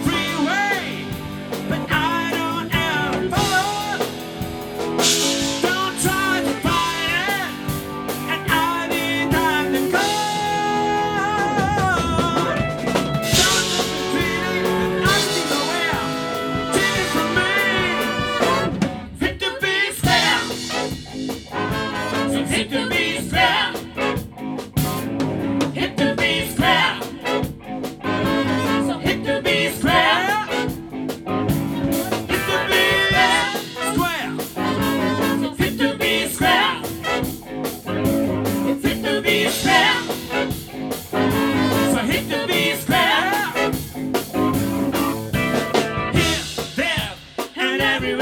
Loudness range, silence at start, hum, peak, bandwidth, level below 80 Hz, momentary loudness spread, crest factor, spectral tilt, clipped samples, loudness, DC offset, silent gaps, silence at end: 2 LU; 0 s; none; -2 dBFS; 19.5 kHz; -42 dBFS; 10 LU; 18 dB; -3.5 dB/octave; under 0.1%; -20 LUFS; under 0.1%; none; 0 s